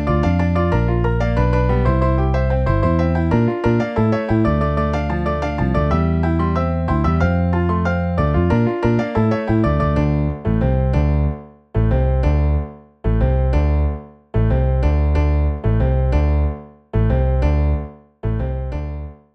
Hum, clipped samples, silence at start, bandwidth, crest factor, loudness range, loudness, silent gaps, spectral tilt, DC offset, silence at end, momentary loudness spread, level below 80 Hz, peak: none; under 0.1%; 0 s; 6.2 kHz; 14 dB; 2 LU; -18 LUFS; none; -9.5 dB/octave; under 0.1%; 0.2 s; 7 LU; -22 dBFS; -4 dBFS